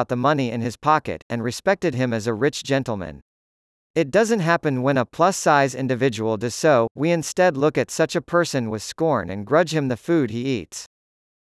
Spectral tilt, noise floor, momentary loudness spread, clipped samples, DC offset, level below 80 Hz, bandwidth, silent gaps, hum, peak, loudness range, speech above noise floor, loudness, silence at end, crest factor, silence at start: -5.5 dB/octave; under -90 dBFS; 8 LU; under 0.1%; under 0.1%; -58 dBFS; 12 kHz; 1.22-1.30 s, 3.22-3.94 s, 6.91-6.95 s; none; -4 dBFS; 4 LU; over 69 dB; -21 LUFS; 0.75 s; 18 dB; 0 s